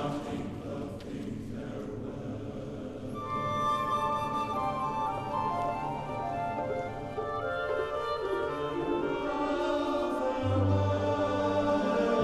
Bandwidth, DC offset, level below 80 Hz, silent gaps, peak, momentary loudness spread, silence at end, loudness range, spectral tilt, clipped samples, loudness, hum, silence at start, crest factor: 12.5 kHz; under 0.1%; -52 dBFS; none; -16 dBFS; 11 LU; 0 s; 5 LU; -7 dB/octave; under 0.1%; -32 LUFS; none; 0 s; 16 dB